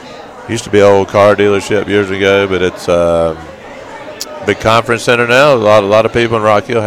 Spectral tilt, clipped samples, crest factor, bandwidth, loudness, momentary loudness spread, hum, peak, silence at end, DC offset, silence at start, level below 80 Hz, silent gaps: -5 dB/octave; 0.5%; 10 dB; 16 kHz; -10 LUFS; 20 LU; none; 0 dBFS; 0 s; under 0.1%; 0 s; -40 dBFS; none